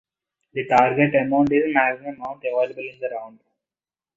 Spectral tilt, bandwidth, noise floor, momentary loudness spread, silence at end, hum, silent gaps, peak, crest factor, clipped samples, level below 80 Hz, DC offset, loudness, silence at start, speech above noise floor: -7.5 dB/octave; 7.6 kHz; under -90 dBFS; 13 LU; 0.85 s; none; none; -2 dBFS; 20 dB; under 0.1%; -60 dBFS; under 0.1%; -21 LUFS; 0.55 s; over 69 dB